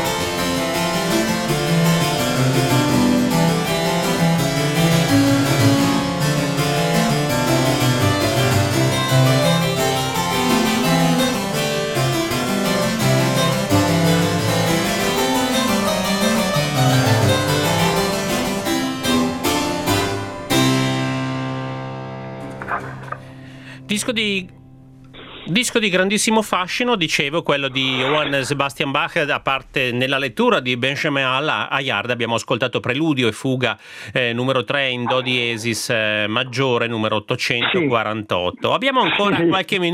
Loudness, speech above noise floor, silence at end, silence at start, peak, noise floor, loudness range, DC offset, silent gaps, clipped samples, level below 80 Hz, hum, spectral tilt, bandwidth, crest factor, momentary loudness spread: -18 LUFS; 24 dB; 0 s; 0 s; 0 dBFS; -43 dBFS; 4 LU; under 0.1%; none; under 0.1%; -44 dBFS; none; -4.5 dB/octave; 17.5 kHz; 18 dB; 5 LU